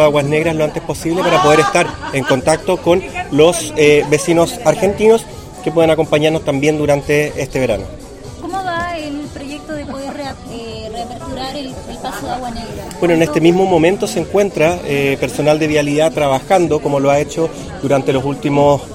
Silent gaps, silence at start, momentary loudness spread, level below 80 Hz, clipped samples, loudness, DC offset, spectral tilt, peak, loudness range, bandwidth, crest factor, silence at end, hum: none; 0 s; 14 LU; -38 dBFS; under 0.1%; -14 LUFS; under 0.1%; -5 dB/octave; 0 dBFS; 11 LU; 16.5 kHz; 14 dB; 0 s; none